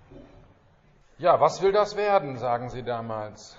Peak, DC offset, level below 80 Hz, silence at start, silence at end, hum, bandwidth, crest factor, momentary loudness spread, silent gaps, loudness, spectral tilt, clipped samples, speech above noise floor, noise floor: -8 dBFS; under 0.1%; -56 dBFS; 0.1 s; 0.05 s; none; 7.6 kHz; 20 dB; 11 LU; none; -25 LUFS; -4 dB/octave; under 0.1%; 34 dB; -58 dBFS